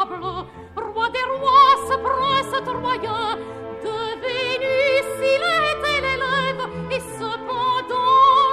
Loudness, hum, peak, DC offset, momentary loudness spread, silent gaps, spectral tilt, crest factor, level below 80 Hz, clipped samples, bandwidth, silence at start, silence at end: -20 LUFS; none; -2 dBFS; under 0.1%; 15 LU; none; -3.5 dB/octave; 18 dB; -48 dBFS; under 0.1%; 13.5 kHz; 0 s; 0 s